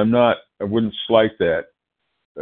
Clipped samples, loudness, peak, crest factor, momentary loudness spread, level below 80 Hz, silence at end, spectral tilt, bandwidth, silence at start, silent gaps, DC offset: under 0.1%; -19 LUFS; 0 dBFS; 18 dB; 8 LU; -54 dBFS; 0 s; -11 dB/octave; 4.2 kHz; 0 s; 2.25-2.35 s; under 0.1%